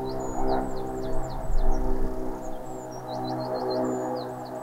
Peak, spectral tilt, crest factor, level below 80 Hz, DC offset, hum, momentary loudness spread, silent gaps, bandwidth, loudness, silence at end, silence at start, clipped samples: -10 dBFS; -6.5 dB/octave; 16 dB; -30 dBFS; under 0.1%; none; 9 LU; none; 8.4 kHz; -31 LUFS; 0 s; 0 s; under 0.1%